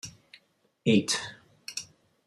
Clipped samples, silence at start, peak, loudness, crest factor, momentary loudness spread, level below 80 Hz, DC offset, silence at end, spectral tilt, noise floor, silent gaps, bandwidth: under 0.1%; 0.05 s; -12 dBFS; -29 LUFS; 20 dB; 20 LU; -70 dBFS; under 0.1%; 0.45 s; -4 dB/octave; -66 dBFS; none; 14.5 kHz